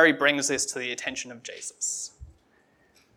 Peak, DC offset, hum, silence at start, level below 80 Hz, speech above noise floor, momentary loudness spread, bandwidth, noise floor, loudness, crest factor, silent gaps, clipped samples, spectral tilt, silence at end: -6 dBFS; under 0.1%; none; 0 s; -58 dBFS; 37 dB; 15 LU; 18.5 kHz; -64 dBFS; -27 LUFS; 22 dB; none; under 0.1%; -1.5 dB/octave; 0.85 s